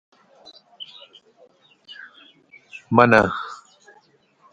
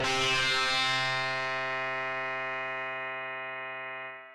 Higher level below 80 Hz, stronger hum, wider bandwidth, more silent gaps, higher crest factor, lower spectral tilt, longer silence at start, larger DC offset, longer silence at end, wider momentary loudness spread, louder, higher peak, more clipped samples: about the same, -56 dBFS vs -60 dBFS; neither; second, 10.5 kHz vs 15.5 kHz; neither; first, 24 dB vs 12 dB; first, -6.5 dB/octave vs -2 dB/octave; first, 0.8 s vs 0 s; neither; first, 1 s vs 0 s; first, 27 LU vs 12 LU; first, -17 LUFS vs -30 LUFS; first, 0 dBFS vs -20 dBFS; neither